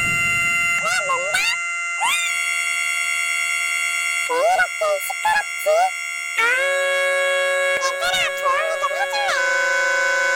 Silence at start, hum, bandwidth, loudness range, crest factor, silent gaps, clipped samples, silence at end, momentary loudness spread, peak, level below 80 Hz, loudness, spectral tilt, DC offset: 0 s; none; 17 kHz; 1 LU; 16 dB; none; under 0.1%; 0 s; 4 LU; -4 dBFS; -58 dBFS; -19 LUFS; 0 dB/octave; under 0.1%